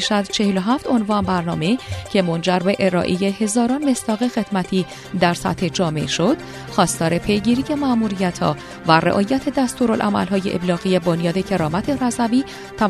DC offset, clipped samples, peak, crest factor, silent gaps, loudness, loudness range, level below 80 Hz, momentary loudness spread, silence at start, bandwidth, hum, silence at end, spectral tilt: under 0.1%; under 0.1%; 0 dBFS; 18 dB; none; -19 LUFS; 1 LU; -46 dBFS; 4 LU; 0 s; 13.5 kHz; none; 0 s; -5 dB/octave